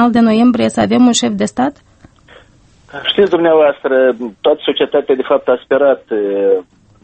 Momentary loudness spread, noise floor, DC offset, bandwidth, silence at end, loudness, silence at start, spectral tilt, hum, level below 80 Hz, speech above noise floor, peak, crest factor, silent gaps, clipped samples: 7 LU; -46 dBFS; under 0.1%; 8.8 kHz; 0.4 s; -13 LUFS; 0 s; -4.5 dB/octave; none; -50 dBFS; 34 dB; 0 dBFS; 12 dB; none; under 0.1%